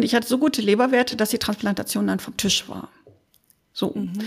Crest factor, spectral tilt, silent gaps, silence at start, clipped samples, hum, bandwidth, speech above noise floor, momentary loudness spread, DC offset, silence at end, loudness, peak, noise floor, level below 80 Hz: 18 dB; -4 dB/octave; none; 0 s; under 0.1%; none; 15.5 kHz; 40 dB; 9 LU; under 0.1%; 0 s; -22 LUFS; -6 dBFS; -62 dBFS; -56 dBFS